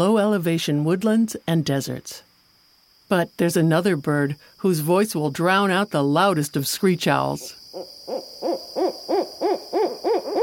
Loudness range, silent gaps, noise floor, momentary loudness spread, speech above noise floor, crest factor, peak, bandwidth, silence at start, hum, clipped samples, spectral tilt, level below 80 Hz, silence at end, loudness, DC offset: 4 LU; none; -58 dBFS; 13 LU; 36 dB; 18 dB; -4 dBFS; 17 kHz; 0 s; none; under 0.1%; -5.5 dB/octave; -64 dBFS; 0 s; -22 LUFS; under 0.1%